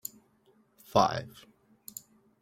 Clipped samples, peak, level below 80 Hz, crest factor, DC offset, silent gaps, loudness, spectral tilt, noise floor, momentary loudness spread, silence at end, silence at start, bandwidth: under 0.1%; -8 dBFS; -66 dBFS; 26 dB; under 0.1%; none; -29 LUFS; -4.5 dB/octave; -66 dBFS; 23 LU; 1.15 s; 0.95 s; 16.5 kHz